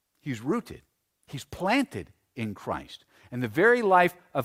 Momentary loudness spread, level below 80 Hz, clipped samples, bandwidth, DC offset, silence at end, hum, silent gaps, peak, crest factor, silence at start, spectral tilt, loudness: 21 LU; -60 dBFS; under 0.1%; 16 kHz; under 0.1%; 0 s; none; none; -8 dBFS; 20 dB; 0.25 s; -6 dB/octave; -26 LUFS